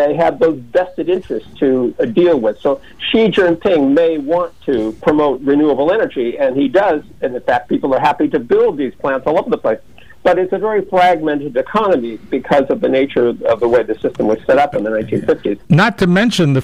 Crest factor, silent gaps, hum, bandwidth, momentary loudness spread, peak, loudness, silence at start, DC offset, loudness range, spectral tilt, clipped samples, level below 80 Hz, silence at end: 12 dB; none; none; 12.5 kHz; 6 LU; -2 dBFS; -15 LUFS; 0 s; 0.9%; 2 LU; -7 dB/octave; under 0.1%; -46 dBFS; 0 s